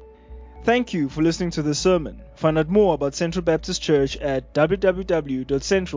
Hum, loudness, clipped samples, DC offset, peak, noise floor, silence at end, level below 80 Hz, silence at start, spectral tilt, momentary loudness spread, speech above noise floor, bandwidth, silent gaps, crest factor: none; -22 LUFS; under 0.1%; under 0.1%; -4 dBFS; -42 dBFS; 0 s; -40 dBFS; 0 s; -5.5 dB/octave; 6 LU; 21 dB; 7.8 kHz; none; 18 dB